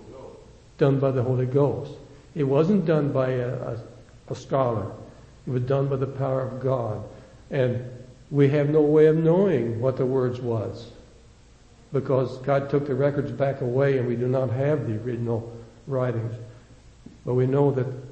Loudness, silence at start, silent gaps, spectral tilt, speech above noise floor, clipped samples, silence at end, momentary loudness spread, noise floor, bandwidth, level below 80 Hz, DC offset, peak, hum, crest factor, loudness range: -24 LUFS; 0 s; none; -9 dB/octave; 29 dB; under 0.1%; 0 s; 17 LU; -52 dBFS; 8.2 kHz; -54 dBFS; under 0.1%; -6 dBFS; none; 18 dB; 6 LU